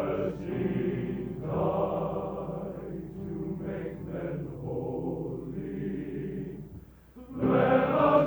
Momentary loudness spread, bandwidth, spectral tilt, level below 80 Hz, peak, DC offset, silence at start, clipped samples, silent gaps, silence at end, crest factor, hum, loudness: 15 LU; over 20 kHz; -9.5 dB/octave; -52 dBFS; -10 dBFS; under 0.1%; 0 s; under 0.1%; none; 0 s; 20 dB; none; -31 LUFS